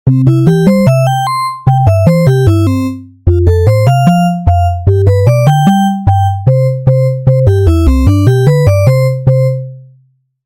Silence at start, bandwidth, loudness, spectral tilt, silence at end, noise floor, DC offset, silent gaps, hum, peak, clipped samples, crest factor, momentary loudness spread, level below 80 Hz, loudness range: 0.05 s; 16 kHz; -9 LUFS; -8 dB/octave; 0.65 s; -51 dBFS; under 0.1%; none; none; 0 dBFS; 0.2%; 8 dB; 5 LU; -24 dBFS; 1 LU